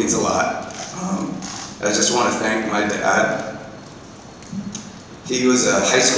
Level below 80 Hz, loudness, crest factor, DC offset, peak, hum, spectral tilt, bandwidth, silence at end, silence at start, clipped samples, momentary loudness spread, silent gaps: -52 dBFS; -19 LUFS; 18 dB; under 0.1%; -4 dBFS; none; -2.5 dB/octave; 8 kHz; 0 s; 0 s; under 0.1%; 21 LU; none